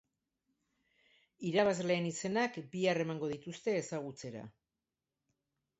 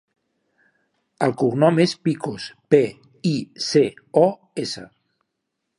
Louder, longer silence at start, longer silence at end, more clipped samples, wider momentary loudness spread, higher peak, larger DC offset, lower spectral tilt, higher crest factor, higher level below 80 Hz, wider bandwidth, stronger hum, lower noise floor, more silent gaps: second, -35 LUFS vs -21 LUFS; first, 1.4 s vs 1.2 s; first, 1.3 s vs 0.95 s; neither; first, 15 LU vs 12 LU; second, -16 dBFS vs -2 dBFS; neither; second, -4.5 dB/octave vs -6 dB/octave; about the same, 22 dB vs 20 dB; second, -76 dBFS vs -66 dBFS; second, 8 kHz vs 11.5 kHz; neither; first, under -90 dBFS vs -78 dBFS; neither